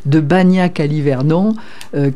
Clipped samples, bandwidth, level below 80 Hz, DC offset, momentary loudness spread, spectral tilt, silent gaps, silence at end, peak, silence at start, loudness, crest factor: under 0.1%; 11 kHz; -52 dBFS; 4%; 9 LU; -8.5 dB/octave; none; 0 s; -2 dBFS; 0.05 s; -14 LUFS; 12 dB